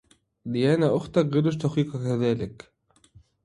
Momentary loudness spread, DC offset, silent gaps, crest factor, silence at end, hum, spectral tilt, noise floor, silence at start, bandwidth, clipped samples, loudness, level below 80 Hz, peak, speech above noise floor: 10 LU; under 0.1%; none; 18 dB; 0.9 s; none; -8 dB/octave; -57 dBFS; 0.45 s; 11 kHz; under 0.1%; -25 LUFS; -58 dBFS; -8 dBFS; 33 dB